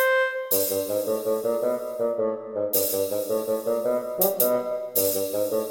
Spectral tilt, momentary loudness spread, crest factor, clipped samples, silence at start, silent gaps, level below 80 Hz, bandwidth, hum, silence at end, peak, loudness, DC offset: -2.5 dB/octave; 5 LU; 18 dB; under 0.1%; 0 s; none; -70 dBFS; 17 kHz; none; 0 s; -8 dBFS; -24 LUFS; under 0.1%